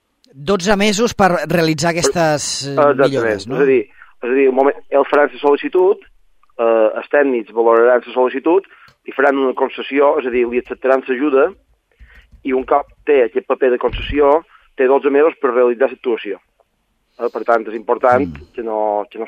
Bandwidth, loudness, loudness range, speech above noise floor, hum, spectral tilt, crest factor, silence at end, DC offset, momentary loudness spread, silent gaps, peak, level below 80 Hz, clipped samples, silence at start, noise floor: 15 kHz; -15 LUFS; 3 LU; 50 dB; none; -4.5 dB/octave; 16 dB; 0 s; under 0.1%; 8 LU; none; 0 dBFS; -42 dBFS; under 0.1%; 0.4 s; -65 dBFS